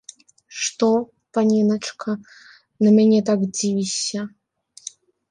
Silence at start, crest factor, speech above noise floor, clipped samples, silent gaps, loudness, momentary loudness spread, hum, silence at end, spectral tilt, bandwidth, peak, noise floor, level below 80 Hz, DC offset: 0.5 s; 14 dB; 28 dB; under 0.1%; none; -20 LUFS; 22 LU; none; 1 s; -5 dB/octave; 10 kHz; -6 dBFS; -47 dBFS; -68 dBFS; under 0.1%